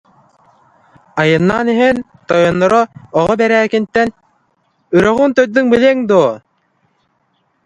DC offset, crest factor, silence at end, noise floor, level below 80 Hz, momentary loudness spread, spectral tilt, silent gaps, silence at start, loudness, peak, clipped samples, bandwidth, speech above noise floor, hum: under 0.1%; 14 dB; 1.3 s; -62 dBFS; -48 dBFS; 7 LU; -6.5 dB/octave; none; 1.15 s; -13 LUFS; 0 dBFS; under 0.1%; 10.5 kHz; 50 dB; none